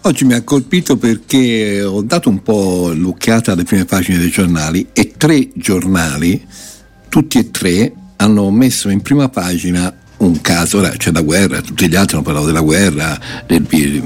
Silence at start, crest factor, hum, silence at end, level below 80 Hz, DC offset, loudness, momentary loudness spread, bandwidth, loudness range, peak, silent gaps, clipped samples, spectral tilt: 0.05 s; 12 dB; none; 0 s; -36 dBFS; under 0.1%; -13 LUFS; 5 LU; 17 kHz; 1 LU; 0 dBFS; none; under 0.1%; -5 dB/octave